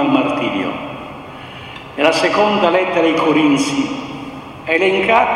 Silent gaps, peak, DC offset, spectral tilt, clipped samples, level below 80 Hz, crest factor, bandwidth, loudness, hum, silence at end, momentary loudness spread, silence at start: none; 0 dBFS; under 0.1%; -4.5 dB/octave; under 0.1%; -50 dBFS; 16 dB; 12 kHz; -15 LUFS; none; 0 s; 18 LU; 0 s